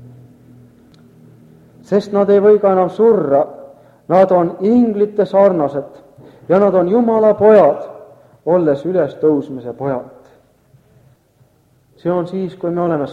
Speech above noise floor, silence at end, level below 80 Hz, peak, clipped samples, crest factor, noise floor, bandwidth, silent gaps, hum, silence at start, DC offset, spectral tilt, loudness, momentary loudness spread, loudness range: 41 dB; 0 s; -58 dBFS; 0 dBFS; under 0.1%; 16 dB; -54 dBFS; 7.2 kHz; none; none; 0.05 s; under 0.1%; -9 dB/octave; -14 LUFS; 13 LU; 10 LU